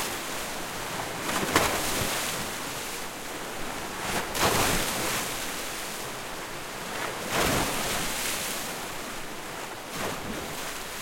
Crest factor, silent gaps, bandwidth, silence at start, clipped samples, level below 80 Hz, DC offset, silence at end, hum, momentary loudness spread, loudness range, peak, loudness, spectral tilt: 24 dB; none; 16.5 kHz; 0 s; under 0.1%; -46 dBFS; under 0.1%; 0 s; none; 11 LU; 1 LU; -6 dBFS; -29 LUFS; -2 dB/octave